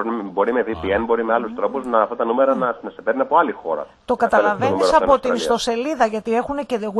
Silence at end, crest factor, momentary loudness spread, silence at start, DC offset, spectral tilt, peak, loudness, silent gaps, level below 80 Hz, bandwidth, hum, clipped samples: 0 s; 18 dB; 8 LU; 0 s; under 0.1%; -5 dB/octave; -2 dBFS; -19 LUFS; none; -48 dBFS; 12 kHz; none; under 0.1%